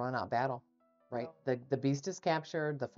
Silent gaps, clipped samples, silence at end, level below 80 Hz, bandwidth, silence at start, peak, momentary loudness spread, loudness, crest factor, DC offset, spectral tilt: none; under 0.1%; 0.1 s; -78 dBFS; 7.6 kHz; 0 s; -18 dBFS; 8 LU; -36 LUFS; 18 dB; under 0.1%; -5.5 dB/octave